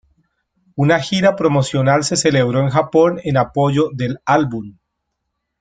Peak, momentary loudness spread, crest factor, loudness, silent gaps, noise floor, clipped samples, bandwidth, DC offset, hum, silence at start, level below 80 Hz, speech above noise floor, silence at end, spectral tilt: 0 dBFS; 7 LU; 16 dB; -16 LUFS; none; -75 dBFS; under 0.1%; 9.4 kHz; under 0.1%; none; 0.75 s; -50 dBFS; 59 dB; 0.9 s; -5.5 dB/octave